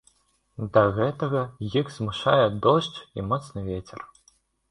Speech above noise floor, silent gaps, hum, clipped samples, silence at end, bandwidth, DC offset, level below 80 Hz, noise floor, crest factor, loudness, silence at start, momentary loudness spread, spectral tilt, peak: 40 dB; none; none; under 0.1%; 0.65 s; 11 kHz; under 0.1%; -52 dBFS; -64 dBFS; 22 dB; -25 LUFS; 0.6 s; 17 LU; -7 dB/octave; -4 dBFS